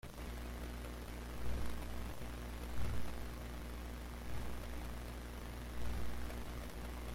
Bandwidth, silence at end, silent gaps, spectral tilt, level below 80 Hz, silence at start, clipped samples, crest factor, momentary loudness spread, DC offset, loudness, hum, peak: 16.5 kHz; 0 s; none; -5.5 dB/octave; -46 dBFS; 0.05 s; under 0.1%; 14 dB; 4 LU; under 0.1%; -47 LUFS; 60 Hz at -45 dBFS; -26 dBFS